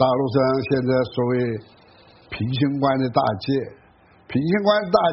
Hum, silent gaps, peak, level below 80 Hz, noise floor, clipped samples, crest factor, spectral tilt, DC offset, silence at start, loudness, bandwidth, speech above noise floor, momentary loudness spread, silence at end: none; none; -2 dBFS; -54 dBFS; -53 dBFS; under 0.1%; 18 dB; -5.5 dB/octave; under 0.1%; 0 s; -21 LUFS; 5.8 kHz; 33 dB; 9 LU; 0 s